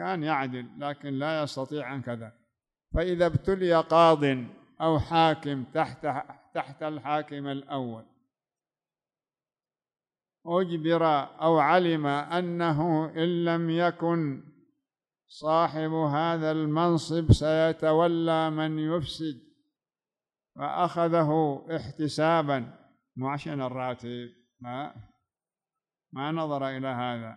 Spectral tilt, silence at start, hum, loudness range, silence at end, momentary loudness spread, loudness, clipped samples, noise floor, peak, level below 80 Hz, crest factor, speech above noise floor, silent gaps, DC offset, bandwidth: -7 dB/octave; 0 s; none; 11 LU; 0 s; 14 LU; -27 LUFS; under 0.1%; under -90 dBFS; -8 dBFS; -48 dBFS; 20 dB; over 63 dB; none; under 0.1%; 11 kHz